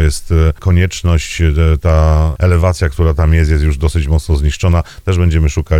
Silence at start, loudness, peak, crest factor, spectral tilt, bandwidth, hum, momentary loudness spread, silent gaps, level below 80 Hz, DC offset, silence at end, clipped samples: 0 s; -13 LUFS; 0 dBFS; 12 dB; -6.5 dB/octave; 11.5 kHz; none; 3 LU; none; -16 dBFS; under 0.1%; 0 s; under 0.1%